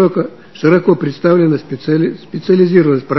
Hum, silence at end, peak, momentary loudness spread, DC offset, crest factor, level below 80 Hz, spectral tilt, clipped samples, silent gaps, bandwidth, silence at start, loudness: none; 0 s; 0 dBFS; 9 LU; 0.7%; 12 dB; -58 dBFS; -9 dB/octave; under 0.1%; none; 6 kHz; 0 s; -13 LUFS